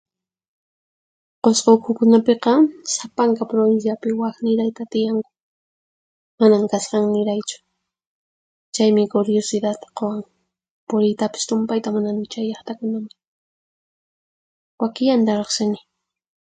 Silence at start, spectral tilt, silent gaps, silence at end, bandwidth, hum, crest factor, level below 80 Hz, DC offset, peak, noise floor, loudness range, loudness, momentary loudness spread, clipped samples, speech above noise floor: 1.45 s; -5 dB/octave; 5.42-6.38 s, 8.06-8.72 s, 10.70-10.87 s, 13.27-14.78 s; 0.8 s; 9.4 kHz; none; 20 dB; -68 dBFS; under 0.1%; -2 dBFS; under -90 dBFS; 7 LU; -19 LUFS; 11 LU; under 0.1%; over 72 dB